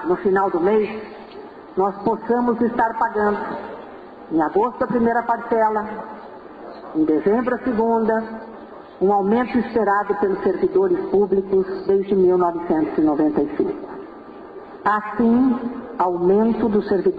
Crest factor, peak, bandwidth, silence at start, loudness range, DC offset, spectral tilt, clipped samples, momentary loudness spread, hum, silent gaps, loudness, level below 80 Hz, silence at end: 12 dB; -8 dBFS; 5 kHz; 0 s; 3 LU; under 0.1%; -9.5 dB/octave; under 0.1%; 20 LU; none; none; -20 LUFS; -52 dBFS; 0 s